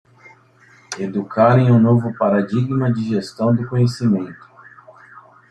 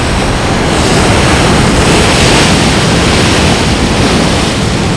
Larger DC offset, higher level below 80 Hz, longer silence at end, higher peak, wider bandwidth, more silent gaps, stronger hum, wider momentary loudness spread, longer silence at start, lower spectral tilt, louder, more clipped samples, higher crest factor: neither; second, -56 dBFS vs -18 dBFS; first, 1.15 s vs 0 s; about the same, -2 dBFS vs 0 dBFS; second, 9.8 kHz vs 11 kHz; neither; neither; first, 11 LU vs 5 LU; first, 0.9 s vs 0 s; first, -8 dB/octave vs -4.5 dB/octave; second, -17 LUFS vs -8 LUFS; second, under 0.1% vs 1%; first, 16 dB vs 8 dB